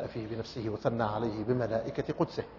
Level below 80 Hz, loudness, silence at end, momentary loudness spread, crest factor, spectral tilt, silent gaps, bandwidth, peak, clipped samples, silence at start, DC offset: -58 dBFS; -33 LUFS; 0 s; 7 LU; 20 dB; -6.5 dB/octave; none; 6 kHz; -14 dBFS; under 0.1%; 0 s; under 0.1%